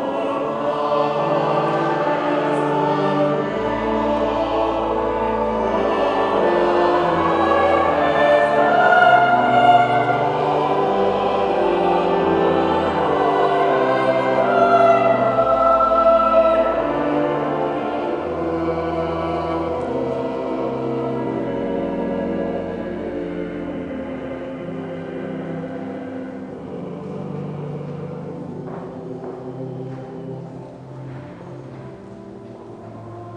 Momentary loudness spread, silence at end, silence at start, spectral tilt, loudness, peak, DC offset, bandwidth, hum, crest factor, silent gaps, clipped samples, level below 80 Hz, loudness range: 17 LU; 0 s; 0 s; -7 dB/octave; -19 LUFS; -2 dBFS; under 0.1%; 9.6 kHz; none; 18 dB; none; under 0.1%; -46 dBFS; 15 LU